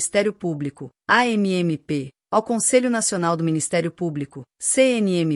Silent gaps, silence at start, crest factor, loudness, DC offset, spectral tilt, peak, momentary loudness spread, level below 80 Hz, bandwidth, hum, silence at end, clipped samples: none; 0 s; 18 dB; -21 LUFS; under 0.1%; -4 dB/octave; -4 dBFS; 10 LU; -64 dBFS; 13.5 kHz; none; 0 s; under 0.1%